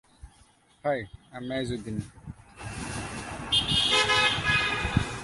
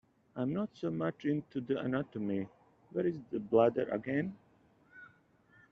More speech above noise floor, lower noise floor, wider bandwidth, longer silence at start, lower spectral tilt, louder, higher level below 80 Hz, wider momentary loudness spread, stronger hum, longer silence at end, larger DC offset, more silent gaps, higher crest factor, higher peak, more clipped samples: about the same, 32 dB vs 33 dB; second, -60 dBFS vs -67 dBFS; first, 11.5 kHz vs 6.6 kHz; about the same, 0.25 s vs 0.35 s; second, -3 dB/octave vs -7 dB/octave; first, -26 LUFS vs -35 LUFS; first, -46 dBFS vs -72 dBFS; first, 21 LU vs 16 LU; neither; second, 0 s vs 0.65 s; neither; neither; about the same, 20 dB vs 22 dB; first, -8 dBFS vs -14 dBFS; neither